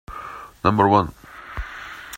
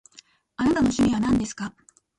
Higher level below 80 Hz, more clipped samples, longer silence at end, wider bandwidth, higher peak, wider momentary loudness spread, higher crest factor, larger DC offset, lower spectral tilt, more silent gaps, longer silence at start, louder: about the same, -42 dBFS vs -46 dBFS; neither; second, 0 s vs 0.5 s; first, 16 kHz vs 11.5 kHz; first, 0 dBFS vs -12 dBFS; first, 19 LU vs 15 LU; first, 22 dB vs 12 dB; neither; first, -7 dB/octave vs -5.5 dB/octave; neither; second, 0.1 s vs 0.6 s; first, -19 LUFS vs -23 LUFS